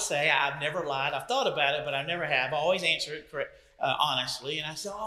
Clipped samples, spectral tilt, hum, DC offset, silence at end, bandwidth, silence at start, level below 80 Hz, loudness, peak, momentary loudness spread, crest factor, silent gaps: under 0.1%; -2.5 dB/octave; none; under 0.1%; 0 s; 15 kHz; 0 s; -64 dBFS; -28 LUFS; -8 dBFS; 10 LU; 22 dB; none